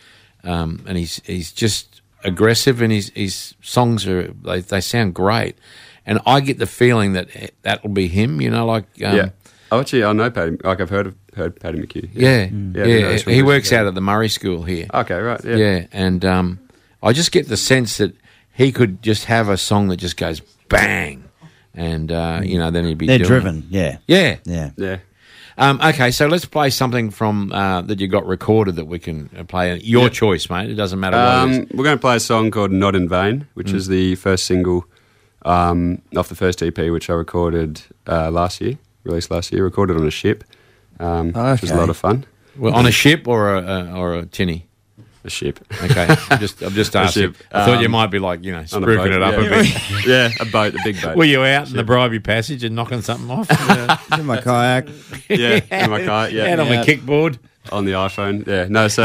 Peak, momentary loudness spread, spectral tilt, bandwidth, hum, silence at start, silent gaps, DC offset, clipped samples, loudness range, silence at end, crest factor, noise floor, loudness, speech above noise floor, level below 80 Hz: -2 dBFS; 11 LU; -5 dB/octave; 16 kHz; none; 0.45 s; none; under 0.1%; under 0.1%; 4 LU; 0 s; 16 dB; -53 dBFS; -17 LUFS; 36 dB; -40 dBFS